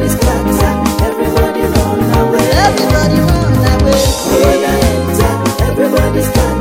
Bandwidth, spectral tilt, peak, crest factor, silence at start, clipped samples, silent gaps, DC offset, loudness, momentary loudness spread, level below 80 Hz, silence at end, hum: 16.5 kHz; -5.5 dB/octave; 0 dBFS; 10 dB; 0 s; under 0.1%; none; under 0.1%; -11 LUFS; 3 LU; -18 dBFS; 0 s; none